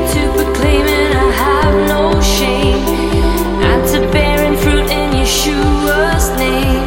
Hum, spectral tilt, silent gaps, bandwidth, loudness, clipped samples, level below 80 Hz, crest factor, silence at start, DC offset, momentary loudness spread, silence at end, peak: none; -4.5 dB/octave; none; 17 kHz; -12 LUFS; under 0.1%; -18 dBFS; 12 dB; 0 s; under 0.1%; 2 LU; 0 s; 0 dBFS